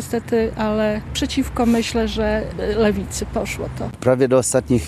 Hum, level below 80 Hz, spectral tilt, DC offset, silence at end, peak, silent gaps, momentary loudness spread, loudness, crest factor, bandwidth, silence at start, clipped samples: none; -34 dBFS; -5 dB/octave; under 0.1%; 0 s; -2 dBFS; none; 8 LU; -20 LUFS; 16 dB; 13.5 kHz; 0 s; under 0.1%